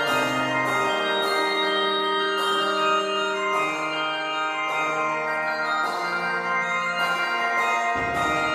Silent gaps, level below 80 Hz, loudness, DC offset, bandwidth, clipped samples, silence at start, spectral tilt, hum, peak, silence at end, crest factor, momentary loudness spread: none; -58 dBFS; -23 LUFS; under 0.1%; 15.5 kHz; under 0.1%; 0 s; -3 dB/octave; none; -10 dBFS; 0 s; 14 dB; 3 LU